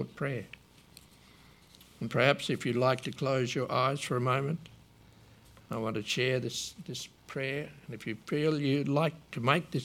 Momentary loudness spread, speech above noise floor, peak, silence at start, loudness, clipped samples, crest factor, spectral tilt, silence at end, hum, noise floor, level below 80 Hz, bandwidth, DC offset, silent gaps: 13 LU; 27 dB; -8 dBFS; 0 s; -32 LUFS; under 0.1%; 24 dB; -5.5 dB/octave; 0 s; none; -58 dBFS; -66 dBFS; 16 kHz; under 0.1%; none